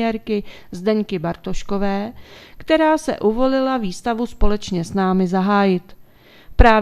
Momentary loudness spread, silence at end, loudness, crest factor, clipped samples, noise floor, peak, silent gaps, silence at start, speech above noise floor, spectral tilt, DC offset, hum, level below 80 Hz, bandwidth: 10 LU; 0 s; -20 LUFS; 18 dB; under 0.1%; -45 dBFS; 0 dBFS; none; 0 s; 26 dB; -6.5 dB/octave; under 0.1%; none; -28 dBFS; 14 kHz